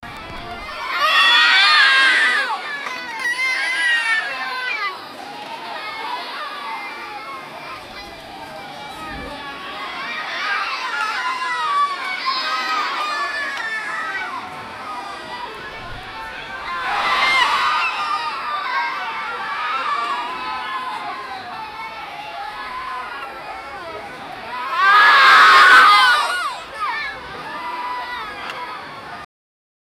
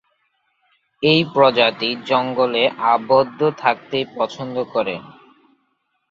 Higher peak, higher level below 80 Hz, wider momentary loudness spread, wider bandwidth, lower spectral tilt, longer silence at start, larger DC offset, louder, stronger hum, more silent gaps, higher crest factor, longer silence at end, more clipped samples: about the same, -2 dBFS vs -2 dBFS; first, -52 dBFS vs -62 dBFS; first, 21 LU vs 10 LU; first, 20 kHz vs 7.2 kHz; second, -0.5 dB/octave vs -6 dB/octave; second, 0 s vs 1 s; neither; about the same, -17 LUFS vs -18 LUFS; neither; neither; about the same, 18 dB vs 18 dB; second, 0.75 s vs 1 s; neither